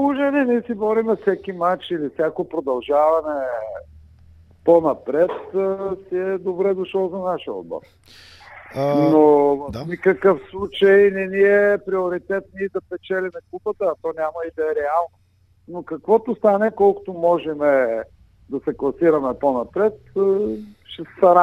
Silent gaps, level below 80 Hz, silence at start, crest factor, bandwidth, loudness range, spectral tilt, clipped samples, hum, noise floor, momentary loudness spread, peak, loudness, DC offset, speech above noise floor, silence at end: none; -54 dBFS; 0 s; 18 dB; 6.2 kHz; 7 LU; -8 dB/octave; under 0.1%; none; -49 dBFS; 14 LU; -2 dBFS; -20 LUFS; under 0.1%; 29 dB; 0 s